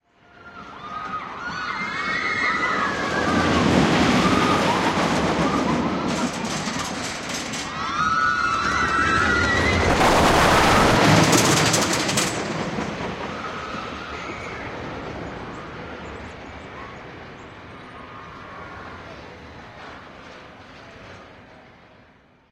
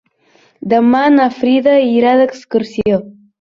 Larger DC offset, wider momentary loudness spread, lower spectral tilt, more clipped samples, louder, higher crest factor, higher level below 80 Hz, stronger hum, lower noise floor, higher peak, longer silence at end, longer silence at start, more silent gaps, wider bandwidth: neither; first, 24 LU vs 8 LU; second, -4 dB/octave vs -7 dB/octave; neither; second, -20 LUFS vs -12 LUFS; first, 20 dB vs 12 dB; first, -40 dBFS vs -52 dBFS; neither; about the same, -54 dBFS vs -52 dBFS; about the same, -2 dBFS vs -2 dBFS; first, 0.9 s vs 0.3 s; second, 0.4 s vs 0.65 s; neither; first, 16 kHz vs 7.2 kHz